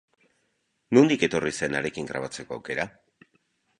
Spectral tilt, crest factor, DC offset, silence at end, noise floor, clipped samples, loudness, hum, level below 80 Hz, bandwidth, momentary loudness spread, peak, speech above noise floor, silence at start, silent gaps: -5 dB/octave; 22 dB; under 0.1%; 0.9 s; -74 dBFS; under 0.1%; -25 LUFS; none; -60 dBFS; 11 kHz; 15 LU; -6 dBFS; 49 dB; 0.9 s; none